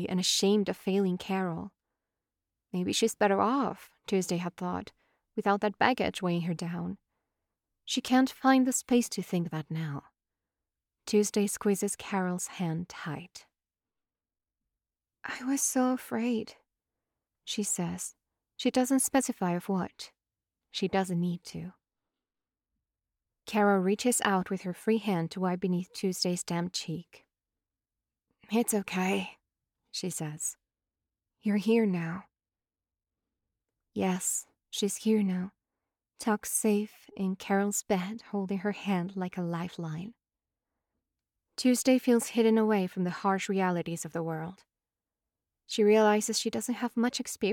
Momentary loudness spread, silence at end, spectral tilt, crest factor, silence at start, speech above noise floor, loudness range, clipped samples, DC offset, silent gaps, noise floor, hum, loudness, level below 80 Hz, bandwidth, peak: 14 LU; 0 s; -4.5 dB/octave; 24 dB; 0 s; over 61 dB; 6 LU; under 0.1%; under 0.1%; none; under -90 dBFS; none; -30 LUFS; -72 dBFS; 18.5 kHz; -8 dBFS